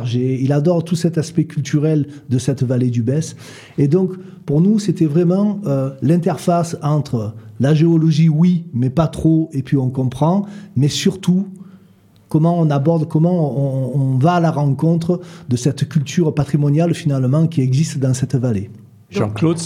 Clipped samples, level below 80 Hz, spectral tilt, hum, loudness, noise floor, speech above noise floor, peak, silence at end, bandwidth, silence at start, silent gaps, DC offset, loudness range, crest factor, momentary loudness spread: under 0.1%; -50 dBFS; -7.5 dB/octave; none; -17 LUFS; -49 dBFS; 33 dB; -2 dBFS; 0 s; 12 kHz; 0 s; none; under 0.1%; 2 LU; 14 dB; 7 LU